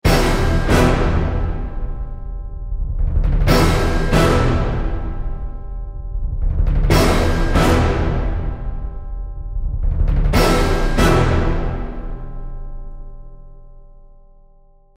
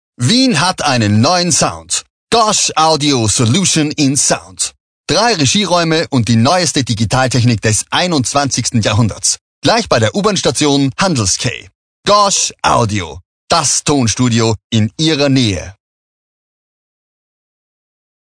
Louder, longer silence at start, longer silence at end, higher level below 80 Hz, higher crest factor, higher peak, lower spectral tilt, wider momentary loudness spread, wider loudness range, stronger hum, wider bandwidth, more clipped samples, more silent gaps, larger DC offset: second, -18 LUFS vs -12 LUFS; second, 0.05 s vs 0.2 s; second, 0.9 s vs 2.5 s; first, -20 dBFS vs -42 dBFS; about the same, 16 dB vs 14 dB; about the same, -2 dBFS vs 0 dBFS; first, -6 dB/octave vs -3.5 dB/octave; first, 17 LU vs 6 LU; about the same, 3 LU vs 3 LU; neither; first, 16 kHz vs 10 kHz; neither; second, none vs 2.10-2.27 s, 4.80-5.04 s, 9.41-9.62 s, 11.75-12.03 s, 13.25-13.47 s, 14.64-14.70 s; second, under 0.1% vs 0.2%